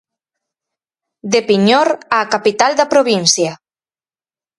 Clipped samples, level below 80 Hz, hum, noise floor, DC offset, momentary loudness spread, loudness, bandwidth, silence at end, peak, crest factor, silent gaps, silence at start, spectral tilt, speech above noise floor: under 0.1%; -64 dBFS; none; under -90 dBFS; under 0.1%; 5 LU; -13 LUFS; 11.5 kHz; 1.05 s; 0 dBFS; 16 dB; none; 1.25 s; -3 dB/octave; over 77 dB